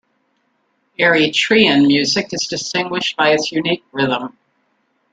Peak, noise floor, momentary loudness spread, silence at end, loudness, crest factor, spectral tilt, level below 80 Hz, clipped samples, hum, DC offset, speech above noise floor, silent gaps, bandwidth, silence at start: 0 dBFS; -65 dBFS; 9 LU; 0.85 s; -15 LUFS; 16 dB; -3.5 dB/octave; -58 dBFS; under 0.1%; none; under 0.1%; 49 dB; none; 9.2 kHz; 1 s